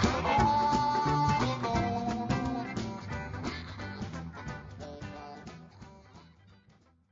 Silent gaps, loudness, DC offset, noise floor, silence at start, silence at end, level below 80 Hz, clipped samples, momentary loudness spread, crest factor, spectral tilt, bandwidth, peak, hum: none; -31 LUFS; under 0.1%; -64 dBFS; 0 s; 0.85 s; -48 dBFS; under 0.1%; 19 LU; 20 dB; -5 dB/octave; 7.6 kHz; -12 dBFS; none